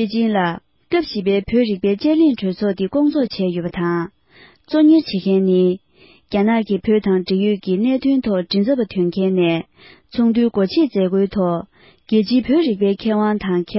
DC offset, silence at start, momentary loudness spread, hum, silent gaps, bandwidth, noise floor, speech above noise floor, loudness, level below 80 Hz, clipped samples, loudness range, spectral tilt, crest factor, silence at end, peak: under 0.1%; 0 s; 6 LU; none; none; 5.8 kHz; -49 dBFS; 32 dB; -18 LUFS; -50 dBFS; under 0.1%; 1 LU; -11.5 dB/octave; 12 dB; 0 s; -4 dBFS